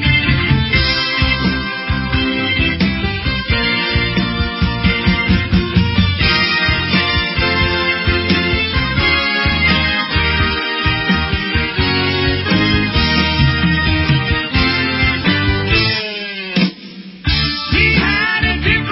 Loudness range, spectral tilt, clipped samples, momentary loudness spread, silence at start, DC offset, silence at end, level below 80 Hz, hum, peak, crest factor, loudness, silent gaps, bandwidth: 2 LU; -9 dB/octave; under 0.1%; 5 LU; 0 s; under 0.1%; 0 s; -24 dBFS; none; 0 dBFS; 16 dB; -14 LUFS; none; 5.8 kHz